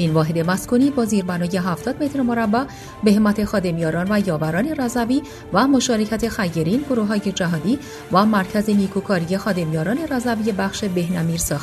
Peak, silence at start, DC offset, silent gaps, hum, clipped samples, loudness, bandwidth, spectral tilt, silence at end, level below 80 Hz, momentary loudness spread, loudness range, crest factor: -2 dBFS; 0 s; under 0.1%; none; none; under 0.1%; -20 LUFS; 14 kHz; -5.5 dB/octave; 0 s; -44 dBFS; 5 LU; 1 LU; 18 dB